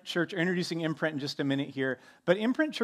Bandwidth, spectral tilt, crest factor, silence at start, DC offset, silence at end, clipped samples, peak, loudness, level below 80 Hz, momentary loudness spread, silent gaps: 14 kHz; -5.5 dB/octave; 20 dB; 0.05 s; under 0.1%; 0 s; under 0.1%; -10 dBFS; -31 LUFS; -80 dBFS; 5 LU; none